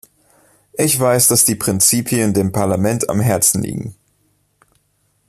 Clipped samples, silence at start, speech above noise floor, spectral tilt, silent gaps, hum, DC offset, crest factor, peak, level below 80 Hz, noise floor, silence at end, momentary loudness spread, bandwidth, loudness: under 0.1%; 0.75 s; 47 dB; -4 dB/octave; none; 50 Hz at -40 dBFS; under 0.1%; 18 dB; 0 dBFS; -50 dBFS; -63 dBFS; 1.35 s; 12 LU; 15 kHz; -14 LUFS